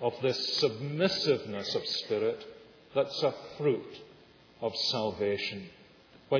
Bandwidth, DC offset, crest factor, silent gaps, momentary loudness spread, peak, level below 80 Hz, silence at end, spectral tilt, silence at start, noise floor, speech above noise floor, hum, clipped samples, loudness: 5.4 kHz; under 0.1%; 18 dB; none; 13 LU; -14 dBFS; -72 dBFS; 0 s; -3 dB/octave; 0 s; -57 dBFS; 26 dB; none; under 0.1%; -31 LUFS